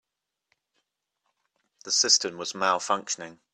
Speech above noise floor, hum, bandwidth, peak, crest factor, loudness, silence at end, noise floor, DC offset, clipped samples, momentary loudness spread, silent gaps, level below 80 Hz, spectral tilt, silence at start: 53 dB; none; 13.5 kHz; -6 dBFS; 24 dB; -24 LUFS; 0.2 s; -79 dBFS; under 0.1%; under 0.1%; 13 LU; none; -78 dBFS; 0 dB/octave; 1.85 s